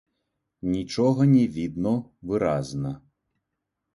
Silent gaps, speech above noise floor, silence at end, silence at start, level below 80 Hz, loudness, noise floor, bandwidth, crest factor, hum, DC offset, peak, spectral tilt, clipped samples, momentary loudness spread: none; 59 dB; 1 s; 0.65 s; -54 dBFS; -25 LUFS; -82 dBFS; 11.5 kHz; 16 dB; none; under 0.1%; -10 dBFS; -8 dB/octave; under 0.1%; 13 LU